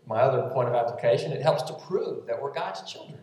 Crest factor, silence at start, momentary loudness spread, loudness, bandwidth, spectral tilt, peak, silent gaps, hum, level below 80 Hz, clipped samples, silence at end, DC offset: 18 dB; 0.05 s; 9 LU; -27 LUFS; 12.5 kHz; -6 dB/octave; -10 dBFS; none; none; -80 dBFS; under 0.1%; 0 s; under 0.1%